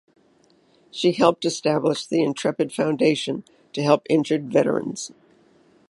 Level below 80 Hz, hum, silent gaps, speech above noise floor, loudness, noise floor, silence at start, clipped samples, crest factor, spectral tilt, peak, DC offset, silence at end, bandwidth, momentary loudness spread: -68 dBFS; none; none; 38 dB; -22 LUFS; -59 dBFS; 0.95 s; under 0.1%; 22 dB; -5 dB/octave; -2 dBFS; under 0.1%; 0.75 s; 11.5 kHz; 13 LU